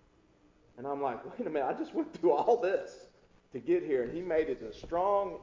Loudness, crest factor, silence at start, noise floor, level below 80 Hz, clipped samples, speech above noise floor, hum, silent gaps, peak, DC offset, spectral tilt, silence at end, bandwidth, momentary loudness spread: -32 LUFS; 18 dB; 0.75 s; -65 dBFS; -62 dBFS; under 0.1%; 33 dB; none; none; -14 dBFS; under 0.1%; -7 dB/octave; 0 s; 7.6 kHz; 12 LU